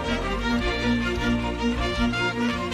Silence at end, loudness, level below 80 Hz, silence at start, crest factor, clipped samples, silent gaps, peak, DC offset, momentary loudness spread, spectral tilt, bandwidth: 0 s; -25 LUFS; -34 dBFS; 0 s; 12 dB; under 0.1%; none; -12 dBFS; under 0.1%; 2 LU; -5.5 dB/octave; 12.5 kHz